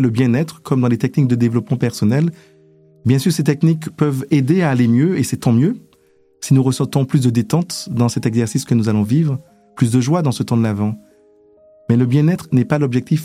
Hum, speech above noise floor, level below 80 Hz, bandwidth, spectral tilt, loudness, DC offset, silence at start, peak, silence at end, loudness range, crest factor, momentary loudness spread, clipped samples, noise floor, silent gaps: none; 39 dB; -56 dBFS; 15.5 kHz; -7 dB/octave; -17 LUFS; under 0.1%; 0 s; -2 dBFS; 0 s; 2 LU; 14 dB; 6 LU; under 0.1%; -54 dBFS; none